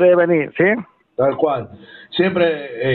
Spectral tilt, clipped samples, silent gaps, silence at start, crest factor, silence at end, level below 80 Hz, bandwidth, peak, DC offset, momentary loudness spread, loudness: -10 dB/octave; under 0.1%; none; 0 s; 14 dB; 0 s; -56 dBFS; 4.4 kHz; -4 dBFS; under 0.1%; 11 LU; -18 LUFS